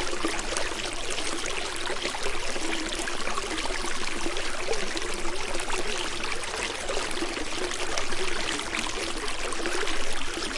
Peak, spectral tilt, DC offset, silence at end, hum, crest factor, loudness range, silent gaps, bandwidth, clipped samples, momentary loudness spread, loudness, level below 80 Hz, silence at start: -10 dBFS; -2 dB/octave; under 0.1%; 0 s; none; 18 dB; 1 LU; none; 11.5 kHz; under 0.1%; 2 LU; -30 LUFS; -36 dBFS; 0 s